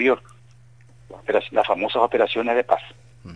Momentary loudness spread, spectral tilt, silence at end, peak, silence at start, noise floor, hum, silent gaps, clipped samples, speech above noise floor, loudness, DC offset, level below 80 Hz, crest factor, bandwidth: 7 LU; -5.5 dB/octave; 0 s; -2 dBFS; 0 s; -50 dBFS; none; none; under 0.1%; 29 dB; -21 LUFS; 0.2%; -60 dBFS; 20 dB; 10 kHz